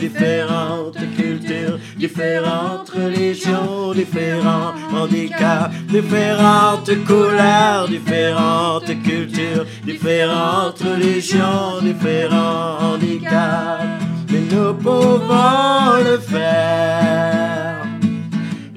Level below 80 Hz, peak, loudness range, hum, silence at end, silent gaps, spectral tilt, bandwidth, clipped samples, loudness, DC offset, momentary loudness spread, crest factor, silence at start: -70 dBFS; 0 dBFS; 5 LU; none; 0 s; none; -6 dB/octave; 14 kHz; under 0.1%; -17 LUFS; under 0.1%; 9 LU; 16 dB; 0 s